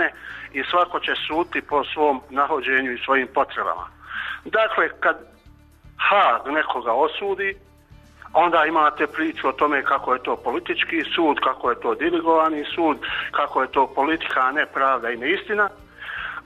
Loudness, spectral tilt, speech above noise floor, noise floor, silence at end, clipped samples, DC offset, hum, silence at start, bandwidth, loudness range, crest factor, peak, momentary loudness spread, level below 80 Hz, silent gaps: -21 LUFS; -5 dB/octave; 29 dB; -50 dBFS; 0.05 s; under 0.1%; under 0.1%; none; 0 s; 13 kHz; 2 LU; 16 dB; -6 dBFS; 8 LU; -54 dBFS; none